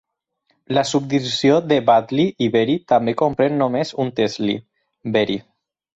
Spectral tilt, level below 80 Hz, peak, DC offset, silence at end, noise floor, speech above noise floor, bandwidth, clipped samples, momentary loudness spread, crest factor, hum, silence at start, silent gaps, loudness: -5.5 dB/octave; -58 dBFS; -4 dBFS; under 0.1%; 0.55 s; -68 dBFS; 50 dB; 8.2 kHz; under 0.1%; 8 LU; 16 dB; none; 0.7 s; none; -19 LUFS